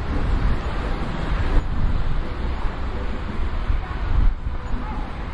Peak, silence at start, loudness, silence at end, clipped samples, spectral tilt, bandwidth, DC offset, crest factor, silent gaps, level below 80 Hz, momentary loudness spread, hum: -4 dBFS; 0 s; -27 LUFS; 0 s; under 0.1%; -7.5 dB/octave; 5.4 kHz; under 0.1%; 16 dB; none; -22 dBFS; 6 LU; none